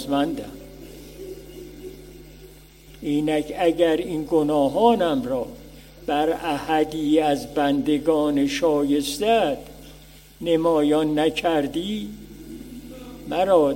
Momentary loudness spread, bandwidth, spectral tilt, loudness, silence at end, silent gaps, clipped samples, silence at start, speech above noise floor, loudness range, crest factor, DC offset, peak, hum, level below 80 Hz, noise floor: 20 LU; 16.5 kHz; -5.5 dB/octave; -22 LUFS; 0 s; none; under 0.1%; 0 s; 25 dB; 5 LU; 18 dB; under 0.1%; -4 dBFS; none; -48 dBFS; -46 dBFS